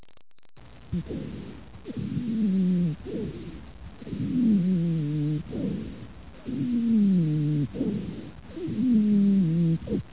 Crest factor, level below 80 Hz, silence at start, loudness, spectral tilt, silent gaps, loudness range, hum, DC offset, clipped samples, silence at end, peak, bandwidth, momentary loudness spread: 12 dB; -48 dBFS; 0 s; -26 LUFS; -12.5 dB/octave; none; 5 LU; none; 0.4%; under 0.1%; 0 s; -14 dBFS; 4 kHz; 20 LU